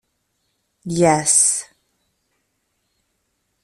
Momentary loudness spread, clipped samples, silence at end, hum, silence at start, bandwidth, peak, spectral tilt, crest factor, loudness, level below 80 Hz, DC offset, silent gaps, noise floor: 14 LU; under 0.1%; 2 s; none; 0.85 s; 14.5 kHz; -2 dBFS; -3.5 dB/octave; 20 dB; -16 LUFS; -58 dBFS; under 0.1%; none; -71 dBFS